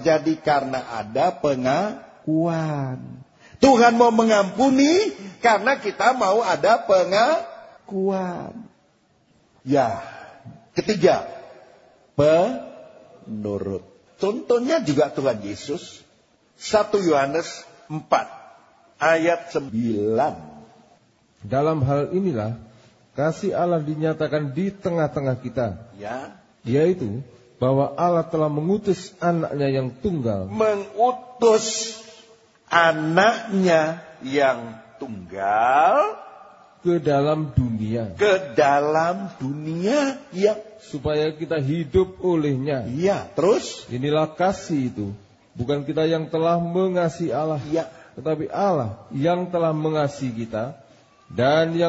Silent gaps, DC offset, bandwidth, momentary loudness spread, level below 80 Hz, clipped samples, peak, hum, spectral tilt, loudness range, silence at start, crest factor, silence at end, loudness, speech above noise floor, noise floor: none; under 0.1%; 8 kHz; 15 LU; -54 dBFS; under 0.1%; 0 dBFS; none; -6 dB/octave; 6 LU; 0 s; 22 dB; 0 s; -22 LUFS; 40 dB; -61 dBFS